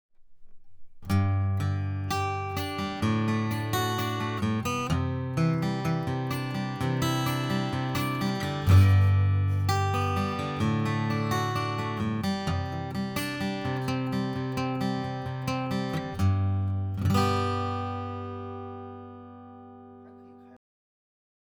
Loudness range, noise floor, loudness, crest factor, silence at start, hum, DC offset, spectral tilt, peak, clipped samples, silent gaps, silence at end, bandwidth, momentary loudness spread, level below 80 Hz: 6 LU; -50 dBFS; -28 LUFS; 20 dB; 0.2 s; none; under 0.1%; -6.5 dB/octave; -8 dBFS; under 0.1%; none; 0.95 s; 19.5 kHz; 10 LU; -52 dBFS